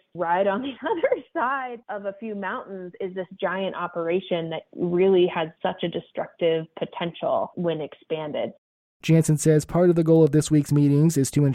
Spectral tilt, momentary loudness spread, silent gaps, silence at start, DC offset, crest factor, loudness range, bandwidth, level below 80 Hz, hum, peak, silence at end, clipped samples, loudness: -6.5 dB/octave; 14 LU; 8.58-9.00 s; 0.15 s; under 0.1%; 16 dB; 8 LU; 15 kHz; -56 dBFS; none; -6 dBFS; 0 s; under 0.1%; -24 LUFS